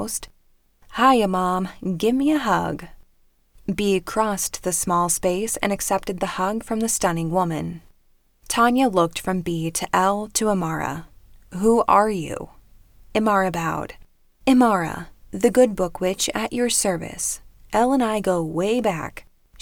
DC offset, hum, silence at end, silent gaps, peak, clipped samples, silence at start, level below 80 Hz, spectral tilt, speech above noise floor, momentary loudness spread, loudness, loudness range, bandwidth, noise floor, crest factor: under 0.1%; none; 0 s; none; -4 dBFS; under 0.1%; 0 s; -46 dBFS; -4 dB/octave; 38 dB; 13 LU; -21 LUFS; 2 LU; over 20 kHz; -59 dBFS; 18 dB